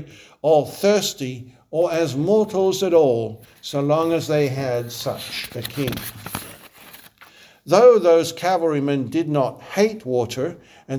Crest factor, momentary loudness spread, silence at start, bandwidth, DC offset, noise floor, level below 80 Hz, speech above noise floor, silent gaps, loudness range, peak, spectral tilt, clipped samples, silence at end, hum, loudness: 20 dB; 14 LU; 0 s; over 20 kHz; under 0.1%; -49 dBFS; -58 dBFS; 29 dB; none; 7 LU; -2 dBFS; -5.5 dB/octave; under 0.1%; 0 s; none; -20 LUFS